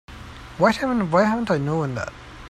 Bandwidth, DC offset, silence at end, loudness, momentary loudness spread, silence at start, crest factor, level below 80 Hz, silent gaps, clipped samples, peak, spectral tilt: 13.5 kHz; under 0.1%; 0 s; -21 LUFS; 20 LU; 0.1 s; 18 dB; -46 dBFS; none; under 0.1%; -4 dBFS; -6.5 dB/octave